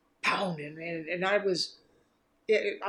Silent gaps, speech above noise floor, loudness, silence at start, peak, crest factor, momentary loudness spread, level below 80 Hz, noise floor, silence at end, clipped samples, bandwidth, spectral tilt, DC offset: none; 39 dB; -30 LUFS; 0.25 s; -14 dBFS; 18 dB; 10 LU; -78 dBFS; -70 dBFS; 0 s; under 0.1%; 11.5 kHz; -4 dB/octave; under 0.1%